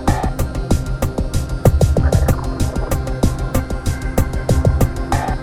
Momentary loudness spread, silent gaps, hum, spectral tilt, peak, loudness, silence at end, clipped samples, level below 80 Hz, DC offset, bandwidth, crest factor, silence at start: 7 LU; none; none; -6.5 dB/octave; 0 dBFS; -19 LUFS; 0 s; under 0.1%; -20 dBFS; under 0.1%; 18 kHz; 16 dB; 0 s